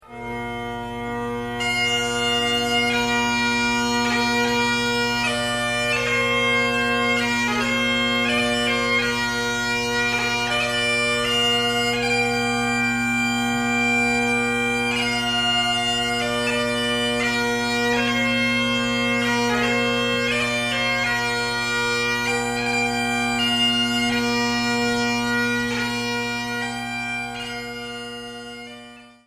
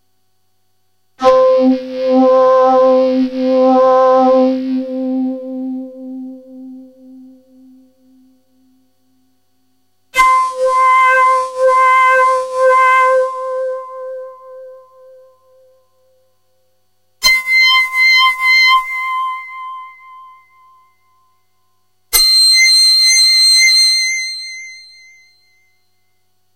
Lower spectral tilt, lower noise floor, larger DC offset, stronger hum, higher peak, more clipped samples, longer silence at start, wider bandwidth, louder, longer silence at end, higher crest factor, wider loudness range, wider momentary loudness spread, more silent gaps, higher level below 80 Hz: first, -3 dB/octave vs 0 dB/octave; second, -43 dBFS vs -66 dBFS; second, under 0.1% vs 0.1%; first, 50 Hz at -45 dBFS vs none; second, -8 dBFS vs 0 dBFS; neither; second, 0.1 s vs 1.2 s; about the same, 15.5 kHz vs 16 kHz; second, -20 LUFS vs -10 LUFS; second, 0.2 s vs 1.75 s; about the same, 14 dB vs 14 dB; second, 2 LU vs 15 LU; second, 8 LU vs 21 LU; neither; about the same, -46 dBFS vs -50 dBFS